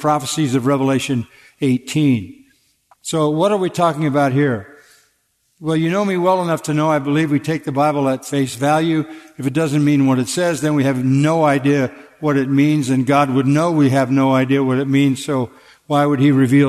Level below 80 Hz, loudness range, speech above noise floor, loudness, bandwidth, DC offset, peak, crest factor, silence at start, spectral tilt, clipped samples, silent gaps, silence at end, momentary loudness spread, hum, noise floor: -60 dBFS; 3 LU; 48 dB; -17 LUFS; 13.5 kHz; under 0.1%; -2 dBFS; 14 dB; 0 s; -6.5 dB/octave; under 0.1%; none; 0 s; 7 LU; none; -64 dBFS